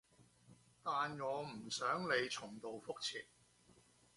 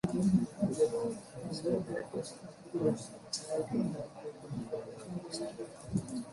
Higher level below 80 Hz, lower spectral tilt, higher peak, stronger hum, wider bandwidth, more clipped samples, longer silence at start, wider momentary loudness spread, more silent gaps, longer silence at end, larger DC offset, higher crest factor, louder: second, -80 dBFS vs -64 dBFS; second, -3 dB/octave vs -6 dB/octave; second, -24 dBFS vs -18 dBFS; first, 60 Hz at -65 dBFS vs none; about the same, 11.5 kHz vs 11.5 kHz; neither; first, 0.2 s vs 0.05 s; about the same, 12 LU vs 12 LU; neither; first, 0.9 s vs 0 s; neither; about the same, 20 dB vs 18 dB; second, -42 LUFS vs -36 LUFS